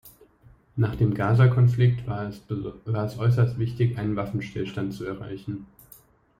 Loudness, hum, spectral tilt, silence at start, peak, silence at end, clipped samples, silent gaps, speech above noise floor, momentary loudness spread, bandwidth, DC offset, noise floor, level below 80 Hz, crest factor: -25 LUFS; none; -9 dB/octave; 0.05 s; -8 dBFS; 0.75 s; under 0.1%; none; 32 dB; 15 LU; 15 kHz; under 0.1%; -56 dBFS; -50 dBFS; 18 dB